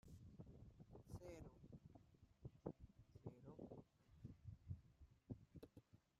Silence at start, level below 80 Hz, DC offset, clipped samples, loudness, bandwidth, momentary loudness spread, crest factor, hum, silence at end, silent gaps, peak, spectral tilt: 0.05 s; -72 dBFS; under 0.1%; under 0.1%; -62 LUFS; 13.5 kHz; 8 LU; 26 dB; none; 0.2 s; none; -36 dBFS; -8 dB/octave